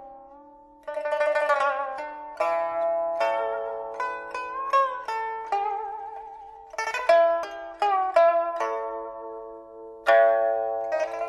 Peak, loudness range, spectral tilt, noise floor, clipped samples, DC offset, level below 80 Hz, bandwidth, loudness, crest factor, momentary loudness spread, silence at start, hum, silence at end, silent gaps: -6 dBFS; 4 LU; -2 dB/octave; -51 dBFS; under 0.1%; under 0.1%; -66 dBFS; 11.5 kHz; -25 LUFS; 20 dB; 18 LU; 0 s; none; 0 s; none